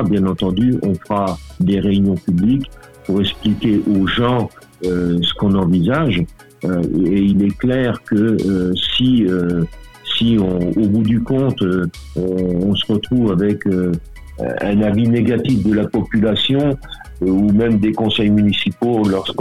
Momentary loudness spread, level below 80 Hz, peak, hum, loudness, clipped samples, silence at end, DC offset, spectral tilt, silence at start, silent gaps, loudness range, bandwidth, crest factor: 7 LU; -38 dBFS; -6 dBFS; none; -16 LUFS; under 0.1%; 0 s; 0.3%; -7.5 dB/octave; 0 s; none; 2 LU; 12 kHz; 10 dB